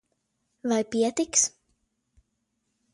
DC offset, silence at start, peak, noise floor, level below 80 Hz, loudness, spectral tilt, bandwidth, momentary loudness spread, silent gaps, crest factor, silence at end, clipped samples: under 0.1%; 0.65 s; -8 dBFS; -77 dBFS; -68 dBFS; -25 LUFS; -2 dB/octave; 11.5 kHz; 5 LU; none; 22 dB; 1.45 s; under 0.1%